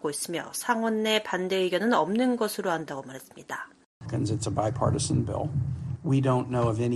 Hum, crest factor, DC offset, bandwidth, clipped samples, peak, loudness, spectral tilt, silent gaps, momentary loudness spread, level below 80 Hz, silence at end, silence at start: none; 18 dB; under 0.1%; 13 kHz; under 0.1%; -10 dBFS; -27 LUFS; -5.5 dB/octave; 3.86-4.01 s; 13 LU; -52 dBFS; 0 s; 0.05 s